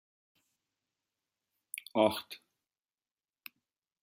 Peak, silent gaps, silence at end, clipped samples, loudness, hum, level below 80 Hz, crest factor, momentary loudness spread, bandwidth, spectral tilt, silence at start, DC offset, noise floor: -12 dBFS; none; 1.65 s; under 0.1%; -32 LUFS; none; -82 dBFS; 28 dB; 23 LU; 16 kHz; -4 dB/octave; 1.95 s; under 0.1%; under -90 dBFS